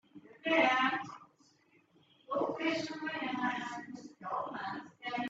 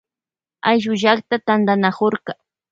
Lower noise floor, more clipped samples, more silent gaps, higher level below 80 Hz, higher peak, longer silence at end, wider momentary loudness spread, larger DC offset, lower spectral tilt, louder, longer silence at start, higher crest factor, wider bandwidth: second, -68 dBFS vs under -90 dBFS; neither; neither; second, -82 dBFS vs -64 dBFS; second, -14 dBFS vs 0 dBFS; second, 0 s vs 0.4 s; first, 17 LU vs 11 LU; neither; second, -4 dB/octave vs -6 dB/octave; second, -34 LUFS vs -18 LUFS; second, 0.15 s vs 0.65 s; about the same, 22 dB vs 18 dB; about the same, 8 kHz vs 7.6 kHz